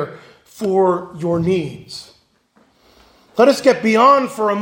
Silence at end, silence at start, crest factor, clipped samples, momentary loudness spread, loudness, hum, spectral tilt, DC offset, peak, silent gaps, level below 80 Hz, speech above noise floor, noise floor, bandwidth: 0 s; 0 s; 16 dB; under 0.1%; 17 LU; -15 LUFS; none; -6 dB/octave; under 0.1%; 0 dBFS; none; -58 dBFS; 42 dB; -57 dBFS; 16.5 kHz